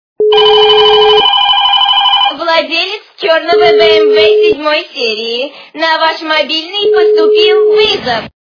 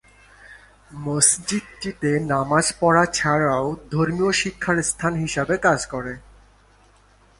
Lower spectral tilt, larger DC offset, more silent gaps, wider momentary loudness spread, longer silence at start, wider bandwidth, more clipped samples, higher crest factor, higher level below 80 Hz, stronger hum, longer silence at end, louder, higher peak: about the same, -3 dB/octave vs -3.5 dB/octave; neither; neither; about the same, 9 LU vs 11 LU; second, 0.2 s vs 0.45 s; second, 5.4 kHz vs 11.5 kHz; first, 0.8% vs under 0.1%; second, 8 dB vs 20 dB; about the same, -48 dBFS vs -48 dBFS; second, none vs 50 Hz at -45 dBFS; second, 0.1 s vs 1.2 s; first, -8 LUFS vs -20 LUFS; about the same, 0 dBFS vs -2 dBFS